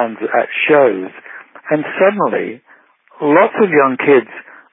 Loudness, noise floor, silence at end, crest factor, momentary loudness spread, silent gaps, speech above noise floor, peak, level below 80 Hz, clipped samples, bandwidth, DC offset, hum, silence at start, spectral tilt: -14 LUFS; -48 dBFS; 0.3 s; 14 dB; 21 LU; none; 35 dB; 0 dBFS; -74 dBFS; under 0.1%; 3.8 kHz; under 0.1%; none; 0 s; -11 dB/octave